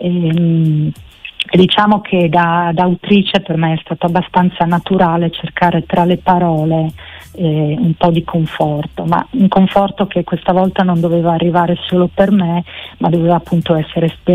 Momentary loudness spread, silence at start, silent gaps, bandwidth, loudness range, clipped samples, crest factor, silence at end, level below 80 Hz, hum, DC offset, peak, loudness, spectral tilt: 6 LU; 0 s; none; 5.2 kHz; 2 LU; under 0.1%; 12 dB; 0 s; -42 dBFS; none; under 0.1%; 0 dBFS; -13 LUFS; -8.5 dB/octave